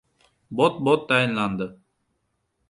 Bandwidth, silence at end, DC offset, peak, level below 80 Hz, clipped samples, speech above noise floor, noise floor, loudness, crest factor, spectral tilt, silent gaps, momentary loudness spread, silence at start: 11.5 kHz; 0.95 s; under 0.1%; -6 dBFS; -62 dBFS; under 0.1%; 52 dB; -74 dBFS; -22 LUFS; 20 dB; -6 dB/octave; none; 13 LU; 0.5 s